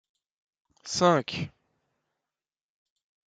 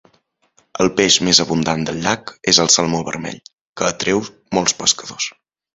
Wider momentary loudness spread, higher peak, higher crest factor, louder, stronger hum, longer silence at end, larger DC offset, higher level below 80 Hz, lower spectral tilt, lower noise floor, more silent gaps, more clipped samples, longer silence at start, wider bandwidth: first, 17 LU vs 14 LU; second, -8 dBFS vs 0 dBFS; first, 24 dB vs 18 dB; second, -26 LUFS vs -16 LUFS; neither; first, 1.85 s vs 0.45 s; neither; second, -68 dBFS vs -50 dBFS; first, -4.5 dB/octave vs -2.5 dB/octave; first, under -90 dBFS vs -61 dBFS; second, none vs 3.53-3.73 s; neither; about the same, 0.85 s vs 0.8 s; second, 9.4 kHz vs 16 kHz